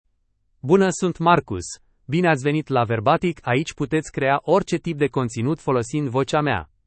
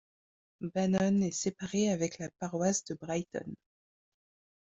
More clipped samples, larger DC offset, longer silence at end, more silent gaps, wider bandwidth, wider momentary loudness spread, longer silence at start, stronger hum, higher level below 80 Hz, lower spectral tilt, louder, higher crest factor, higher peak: neither; neither; second, 0.2 s vs 1.1 s; neither; about the same, 8.8 kHz vs 8.2 kHz; second, 7 LU vs 13 LU; about the same, 0.65 s vs 0.6 s; neither; first, -52 dBFS vs -68 dBFS; about the same, -6 dB/octave vs -5 dB/octave; first, -21 LUFS vs -33 LUFS; about the same, 18 dB vs 18 dB; first, -2 dBFS vs -16 dBFS